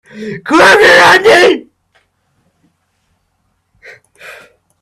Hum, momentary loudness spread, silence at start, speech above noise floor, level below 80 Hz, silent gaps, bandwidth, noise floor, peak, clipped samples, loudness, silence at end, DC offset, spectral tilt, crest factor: none; 17 LU; 0.15 s; 56 dB; -48 dBFS; none; 15 kHz; -62 dBFS; 0 dBFS; 0.4%; -6 LUFS; 0.5 s; under 0.1%; -3 dB/octave; 12 dB